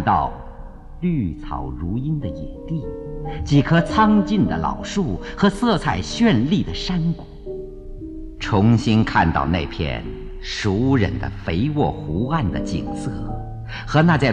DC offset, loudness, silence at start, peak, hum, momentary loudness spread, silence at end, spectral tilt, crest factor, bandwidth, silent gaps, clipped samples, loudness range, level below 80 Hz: under 0.1%; -21 LUFS; 0 s; -4 dBFS; none; 16 LU; 0 s; -7 dB/octave; 16 dB; 10.5 kHz; none; under 0.1%; 4 LU; -34 dBFS